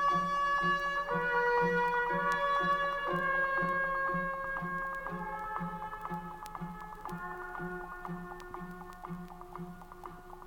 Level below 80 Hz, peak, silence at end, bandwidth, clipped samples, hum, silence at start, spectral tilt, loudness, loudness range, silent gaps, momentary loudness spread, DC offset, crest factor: -54 dBFS; -18 dBFS; 0 s; 18.5 kHz; under 0.1%; none; 0 s; -5.5 dB/octave; -33 LUFS; 13 LU; none; 16 LU; under 0.1%; 16 dB